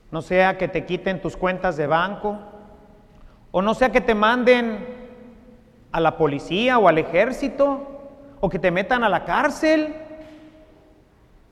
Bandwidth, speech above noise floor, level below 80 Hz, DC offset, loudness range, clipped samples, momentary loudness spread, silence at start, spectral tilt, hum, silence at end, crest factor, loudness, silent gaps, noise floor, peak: 13 kHz; 33 dB; -46 dBFS; under 0.1%; 3 LU; under 0.1%; 14 LU; 0.1 s; -6 dB/octave; none; 1 s; 20 dB; -20 LUFS; none; -53 dBFS; -2 dBFS